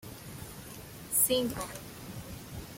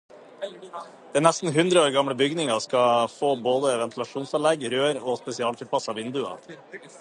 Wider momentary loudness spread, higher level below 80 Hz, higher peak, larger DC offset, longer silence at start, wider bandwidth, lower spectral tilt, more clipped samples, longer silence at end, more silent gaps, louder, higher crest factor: about the same, 19 LU vs 18 LU; first, -56 dBFS vs -74 dBFS; second, -12 dBFS vs -2 dBFS; neither; second, 0 s vs 0.15 s; first, 16.5 kHz vs 11.5 kHz; about the same, -3 dB/octave vs -4 dB/octave; neither; about the same, 0 s vs 0 s; neither; second, -29 LUFS vs -24 LUFS; about the same, 22 dB vs 22 dB